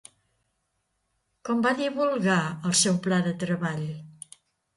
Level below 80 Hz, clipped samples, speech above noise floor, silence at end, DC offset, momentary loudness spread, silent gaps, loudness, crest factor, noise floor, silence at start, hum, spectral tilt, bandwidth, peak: -68 dBFS; under 0.1%; 51 dB; 0.65 s; under 0.1%; 19 LU; none; -25 LUFS; 18 dB; -76 dBFS; 1.45 s; none; -4 dB/octave; 11.5 kHz; -10 dBFS